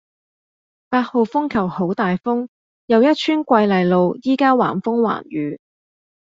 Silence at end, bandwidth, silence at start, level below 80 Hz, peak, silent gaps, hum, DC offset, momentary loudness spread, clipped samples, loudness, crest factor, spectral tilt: 0.8 s; 7.6 kHz; 0.9 s; -58 dBFS; -2 dBFS; 2.48-2.88 s; none; under 0.1%; 9 LU; under 0.1%; -18 LUFS; 16 dB; -7.5 dB/octave